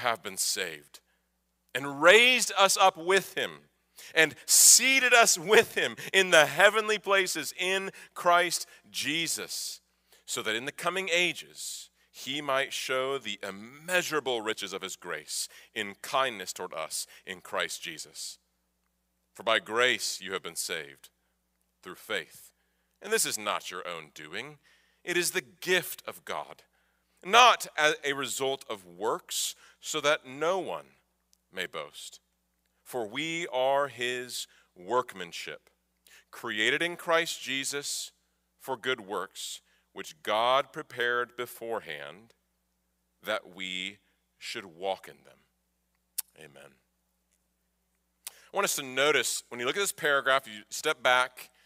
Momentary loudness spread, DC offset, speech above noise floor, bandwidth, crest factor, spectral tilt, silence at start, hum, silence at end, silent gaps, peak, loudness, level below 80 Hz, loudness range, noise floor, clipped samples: 19 LU; under 0.1%; 48 dB; 16 kHz; 26 dB; -0.5 dB/octave; 0 s; none; 0.2 s; none; -4 dBFS; -27 LUFS; -76 dBFS; 16 LU; -77 dBFS; under 0.1%